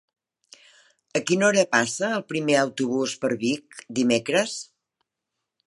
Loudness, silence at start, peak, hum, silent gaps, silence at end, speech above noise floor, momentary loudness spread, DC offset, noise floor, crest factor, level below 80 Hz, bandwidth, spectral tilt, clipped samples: -23 LUFS; 1.15 s; -4 dBFS; none; none; 1.05 s; 60 dB; 10 LU; under 0.1%; -83 dBFS; 22 dB; -70 dBFS; 11.5 kHz; -3.5 dB/octave; under 0.1%